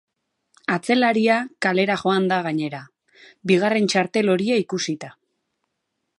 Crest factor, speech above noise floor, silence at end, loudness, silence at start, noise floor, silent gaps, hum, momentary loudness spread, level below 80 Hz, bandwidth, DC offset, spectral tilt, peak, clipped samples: 18 dB; 57 dB; 1.05 s; -21 LUFS; 0.7 s; -77 dBFS; none; none; 13 LU; -70 dBFS; 11.5 kHz; under 0.1%; -5 dB/octave; -4 dBFS; under 0.1%